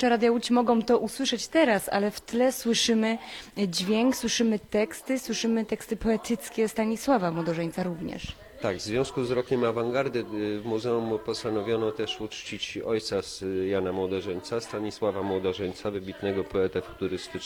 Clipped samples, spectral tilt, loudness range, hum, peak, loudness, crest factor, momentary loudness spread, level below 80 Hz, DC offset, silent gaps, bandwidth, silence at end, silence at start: under 0.1%; -4.5 dB/octave; 5 LU; none; -10 dBFS; -28 LUFS; 18 dB; 9 LU; -54 dBFS; under 0.1%; none; 17.5 kHz; 0 s; 0 s